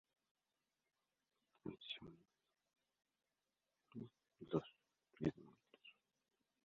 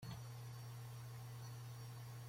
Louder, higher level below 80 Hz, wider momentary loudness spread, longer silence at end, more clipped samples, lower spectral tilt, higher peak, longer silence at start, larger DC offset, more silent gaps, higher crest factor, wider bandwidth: first, -49 LUFS vs -53 LUFS; second, -78 dBFS vs -72 dBFS; first, 20 LU vs 1 LU; first, 0.75 s vs 0 s; neither; about the same, -5.5 dB/octave vs -5 dB/octave; first, -26 dBFS vs -38 dBFS; first, 1.65 s vs 0 s; neither; neither; first, 28 dB vs 12 dB; second, 6.8 kHz vs 16.5 kHz